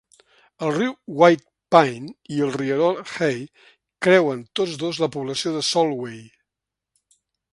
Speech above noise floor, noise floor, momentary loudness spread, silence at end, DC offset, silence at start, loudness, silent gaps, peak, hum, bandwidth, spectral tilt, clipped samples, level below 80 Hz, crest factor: 65 dB; -85 dBFS; 13 LU; 1.25 s; under 0.1%; 0.6 s; -21 LUFS; none; 0 dBFS; none; 11.5 kHz; -5 dB/octave; under 0.1%; -68 dBFS; 22 dB